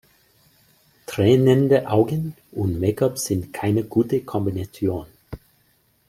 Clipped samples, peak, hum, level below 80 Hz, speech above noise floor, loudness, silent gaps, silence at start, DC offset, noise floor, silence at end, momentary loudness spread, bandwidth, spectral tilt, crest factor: under 0.1%; -4 dBFS; none; -52 dBFS; 42 dB; -21 LUFS; none; 1.1 s; under 0.1%; -62 dBFS; 0.7 s; 19 LU; 16 kHz; -7 dB/octave; 18 dB